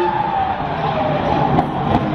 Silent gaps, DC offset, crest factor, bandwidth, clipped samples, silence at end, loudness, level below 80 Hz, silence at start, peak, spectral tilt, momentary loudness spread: none; under 0.1%; 16 dB; 6.8 kHz; under 0.1%; 0 s; -18 LUFS; -36 dBFS; 0 s; -2 dBFS; -8 dB/octave; 4 LU